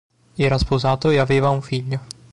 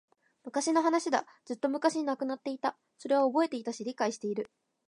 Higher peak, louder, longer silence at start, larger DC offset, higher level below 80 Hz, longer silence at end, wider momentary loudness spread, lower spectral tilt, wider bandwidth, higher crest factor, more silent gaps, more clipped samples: first, -8 dBFS vs -12 dBFS; first, -20 LUFS vs -31 LUFS; about the same, 0.35 s vs 0.45 s; neither; first, -36 dBFS vs -86 dBFS; second, 0.2 s vs 0.4 s; about the same, 11 LU vs 11 LU; first, -6.5 dB/octave vs -3.5 dB/octave; about the same, 11 kHz vs 11 kHz; second, 12 dB vs 18 dB; neither; neither